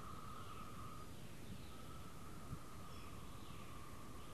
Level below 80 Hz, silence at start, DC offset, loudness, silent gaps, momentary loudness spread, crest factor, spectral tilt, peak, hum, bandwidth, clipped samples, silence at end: -62 dBFS; 0 s; 0.2%; -55 LUFS; none; 2 LU; 16 dB; -5 dB/octave; -36 dBFS; none; 13 kHz; under 0.1%; 0 s